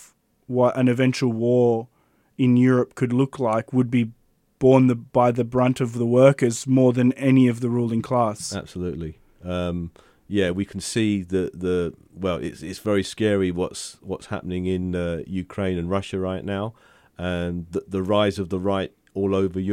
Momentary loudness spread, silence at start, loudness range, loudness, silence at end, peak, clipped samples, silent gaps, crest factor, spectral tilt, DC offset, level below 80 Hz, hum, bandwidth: 13 LU; 0 s; 8 LU; -22 LUFS; 0 s; -4 dBFS; under 0.1%; none; 18 dB; -6.5 dB/octave; under 0.1%; -52 dBFS; none; 13 kHz